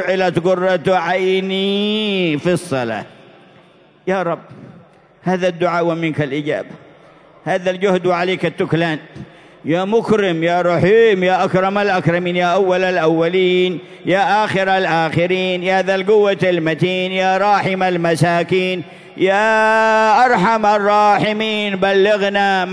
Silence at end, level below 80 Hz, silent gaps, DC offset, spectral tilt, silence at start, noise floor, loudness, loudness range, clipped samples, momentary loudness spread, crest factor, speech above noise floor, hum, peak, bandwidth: 0 s; -58 dBFS; none; under 0.1%; -6 dB/octave; 0 s; -48 dBFS; -15 LUFS; 7 LU; under 0.1%; 8 LU; 14 dB; 33 dB; none; -2 dBFS; 11 kHz